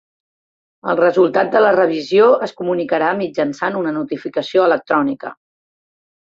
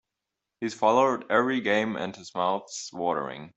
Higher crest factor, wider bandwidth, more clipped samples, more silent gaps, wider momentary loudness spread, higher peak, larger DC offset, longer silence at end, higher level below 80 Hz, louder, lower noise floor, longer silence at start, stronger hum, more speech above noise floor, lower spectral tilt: second, 14 dB vs 20 dB; about the same, 7.6 kHz vs 8.2 kHz; neither; neither; about the same, 10 LU vs 12 LU; first, -2 dBFS vs -8 dBFS; neither; first, 0.9 s vs 0.1 s; first, -64 dBFS vs -70 dBFS; first, -16 LUFS vs -26 LUFS; first, under -90 dBFS vs -86 dBFS; first, 0.85 s vs 0.6 s; neither; first, over 74 dB vs 59 dB; first, -6.5 dB/octave vs -4 dB/octave